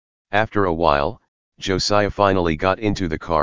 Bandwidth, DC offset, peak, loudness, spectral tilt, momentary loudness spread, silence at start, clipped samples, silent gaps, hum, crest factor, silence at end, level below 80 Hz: 7.6 kHz; 2%; 0 dBFS; -20 LUFS; -5 dB/octave; 7 LU; 0.25 s; under 0.1%; 1.28-1.52 s; none; 18 dB; 0 s; -38 dBFS